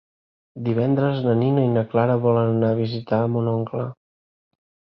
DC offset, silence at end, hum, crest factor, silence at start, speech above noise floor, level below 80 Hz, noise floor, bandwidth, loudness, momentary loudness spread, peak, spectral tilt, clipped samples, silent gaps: under 0.1%; 1.05 s; none; 18 dB; 0.55 s; over 70 dB; -60 dBFS; under -90 dBFS; 5.6 kHz; -21 LUFS; 8 LU; -4 dBFS; -11 dB/octave; under 0.1%; none